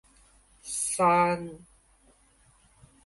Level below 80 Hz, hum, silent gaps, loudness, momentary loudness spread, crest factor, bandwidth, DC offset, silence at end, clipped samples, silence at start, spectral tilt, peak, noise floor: -62 dBFS; none; none; -26 LUFS; 20 LU; 20 dB; 12 kHz; under 0.1%; 1.5 s; under 0.1%; 0.65 s; -4 dB/octave; -12 dBFS; -62 dBFS